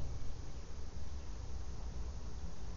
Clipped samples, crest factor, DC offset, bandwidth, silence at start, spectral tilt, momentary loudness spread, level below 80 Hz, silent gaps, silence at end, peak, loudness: under 0.1%; 14 dB; 0.8%; 7.4 kHz; 0 s; -6.5 dB/octave; 3 LU; -46 dBFS; none; 0 s; -28 dBFS; -48 LUFS